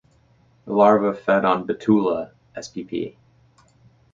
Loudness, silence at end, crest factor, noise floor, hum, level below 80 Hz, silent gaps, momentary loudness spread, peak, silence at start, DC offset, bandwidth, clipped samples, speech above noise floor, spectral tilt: -20 LUFS; 1.05 s; 20 dB; -58 dBFS; none; -60 dBFS; none; 18 LU; -2 dBFS; 0.65 s; under 0.1%; 7.6 kHz; under 0.1%; 38 dB; -7 dB/octave